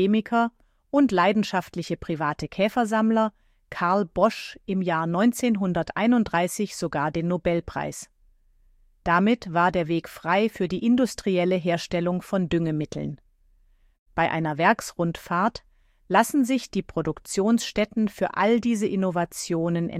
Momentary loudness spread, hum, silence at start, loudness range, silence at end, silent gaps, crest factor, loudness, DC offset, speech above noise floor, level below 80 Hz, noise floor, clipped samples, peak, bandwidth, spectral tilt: 8 LU; none; 0 s; 3 LU; 0 s; 13.99-14.06 s; 18 dB; -24 LUFS; under 0.1%; 36 dB; -52 dBFS; -60 dBFS; under 0.1%; -6 dBFS; 15 kHz; -5.5 dB/octave